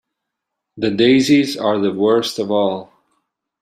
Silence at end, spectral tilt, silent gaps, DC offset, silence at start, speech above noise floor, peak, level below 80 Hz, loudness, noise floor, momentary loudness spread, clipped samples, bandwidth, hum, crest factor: 0.75 s; -5 dB/octave; none; under 0.1%; 0.75 s; 64 dB; -2 dBFS; -58 dBFS; -16 LUFS; -79 dBFS; 9 LU; under 0.1%; 15 kHz; none; 16 dB